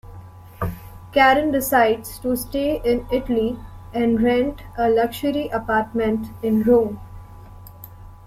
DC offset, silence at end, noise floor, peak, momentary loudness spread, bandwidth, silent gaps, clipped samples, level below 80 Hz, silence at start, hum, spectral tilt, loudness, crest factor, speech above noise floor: under 0.1%; 0 s; -40 dBFS; -2 dBFS; 17 LU; 16.5 kHz; none; under 0.1%; -42 dBFS; 0.05 s; none; -5.5 dB/octave; -20 LUFS; 18 dB; 21 dB